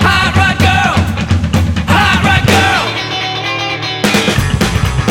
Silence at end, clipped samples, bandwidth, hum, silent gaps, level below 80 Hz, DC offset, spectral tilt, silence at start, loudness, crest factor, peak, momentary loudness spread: 0 s; under 0.1%; 17 kHz; none; none; -24 dBFS; under 0.1%; -4.5 dB/octave; 0 s; -11 LUFS; 10 dB; 0 dBFS; 7 LU